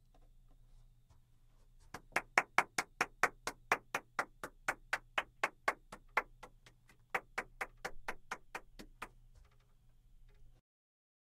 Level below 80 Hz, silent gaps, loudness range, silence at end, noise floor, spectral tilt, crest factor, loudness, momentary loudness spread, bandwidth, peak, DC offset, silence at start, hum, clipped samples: -62 dBFS; none; 12 LU; 0.85 s; -66 dBFS; -1.5 dB/octave; 32 dB; -39 LUFS; 18 LU; 16 kHz; -12 dBFS; under 0.1%; 1.95 s; none; under 0.1%